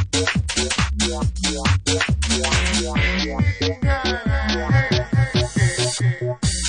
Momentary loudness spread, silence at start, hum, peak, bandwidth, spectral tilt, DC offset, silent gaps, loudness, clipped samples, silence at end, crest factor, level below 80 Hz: 3 LU; 0 s; none; -6 dBFS; 10.5 kHz; -4 dB/octave; under 0.1%; none; -20 LUFS; under 0.1%; 0 s; 14 dB; -28 dBFS